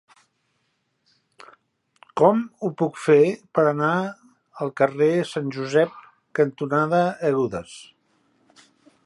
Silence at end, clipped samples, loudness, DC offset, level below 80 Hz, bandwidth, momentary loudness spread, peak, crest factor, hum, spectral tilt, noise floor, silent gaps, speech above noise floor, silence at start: 1.25 s; under 0.1%; -22 LUFS; under 0.1%; -66 dBFS; 11.5 kHz; 13 LU; -2 dBFS; 20 dB; none; -7 dB/octave; -72 dBFS; none; 51 dB; 2.15 s